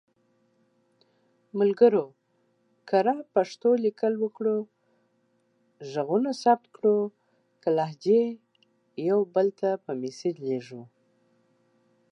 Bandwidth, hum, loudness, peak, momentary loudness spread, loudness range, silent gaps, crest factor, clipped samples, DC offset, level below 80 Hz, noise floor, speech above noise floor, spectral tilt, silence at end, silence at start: 8.8 kHz; none; -26 LUFS; -8 dBFS; 12 LU; 4 LU; none; 20 dB; under 0.1%; under 0.1%; -86 dBFS; -70 dBFS; 45 dB; -7 dB/octave; 1.25 s; 1.55 s